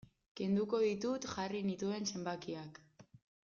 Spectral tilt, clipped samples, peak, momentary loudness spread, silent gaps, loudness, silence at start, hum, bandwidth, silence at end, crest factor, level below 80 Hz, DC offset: -5.5 dB/octave; under 0.1%; -24 dBFS; 12 LU; none; -38 LUFS; 0.35 s; none; 7.4 kHz; 0.4 s; 16 dB; -74 dBFS; under 0.1%